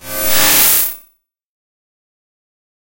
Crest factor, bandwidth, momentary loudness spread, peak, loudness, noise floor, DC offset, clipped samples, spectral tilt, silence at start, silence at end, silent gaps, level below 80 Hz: 18 dB; over 20 kHz; 12 LU; 0 dBFS; -10 LUFS; -54 dBFS; under 0.1%; under 0.1%; 0 dB/octave; 0 s; 1.4 s; none; -46 dBFS